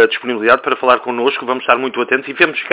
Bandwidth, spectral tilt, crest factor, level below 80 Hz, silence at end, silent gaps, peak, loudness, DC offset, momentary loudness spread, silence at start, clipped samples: 4 kHz; -7 dB/octave; 14 dB; -58 dBFS; 0 s; none; 0 dBFS; -15 LUFS; under 0.1%; 4 LU; 0 s; under 0.1%